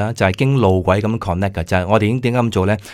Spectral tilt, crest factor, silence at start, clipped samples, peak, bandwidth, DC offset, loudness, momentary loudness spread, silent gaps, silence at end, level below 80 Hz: -7 dB/octave; 16 dB; 0 s; under 0.1%; 0 dBFS; 14 kHz; under 0.1%; -17 LUFS; 5 LU; none; 0 s; -40 dBFS